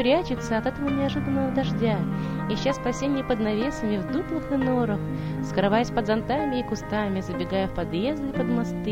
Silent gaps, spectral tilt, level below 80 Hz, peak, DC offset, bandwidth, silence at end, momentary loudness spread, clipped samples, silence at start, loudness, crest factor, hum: none; -6.5 dB/octave; -42 dBFS; -8 dBFS; under 0.1%; 16 kHz; 0 s; 4 LU; under 0.1%; 0 s; -26 LUFS; 18 dB; none